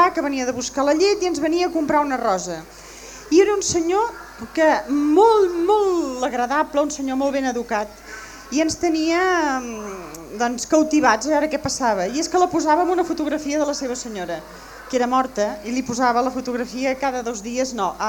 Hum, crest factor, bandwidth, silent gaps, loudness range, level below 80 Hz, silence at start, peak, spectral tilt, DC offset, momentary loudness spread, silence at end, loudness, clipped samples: none; 18 dB; over 20 kHz; none; 4 LU; -50 dBFS; 0 s; -2 dBFS; -3.5 dB/octave; under 0.1%; 13 LU; 0 s; -20 LUFS; under 0.1%